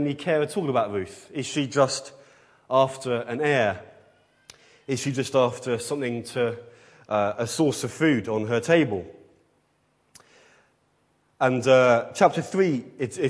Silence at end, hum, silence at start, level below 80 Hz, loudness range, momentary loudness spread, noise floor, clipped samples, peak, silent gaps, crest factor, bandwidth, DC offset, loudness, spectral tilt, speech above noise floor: 0 s; none; 0 s; -68 dBFS; 4 LU; 11 LU; -67 dBFS; under 0.1%; -4 dBFS; none; 22 dB; 11 kHz; under 0.1%; -24 LUFS; -5 dB/octave; 44 dB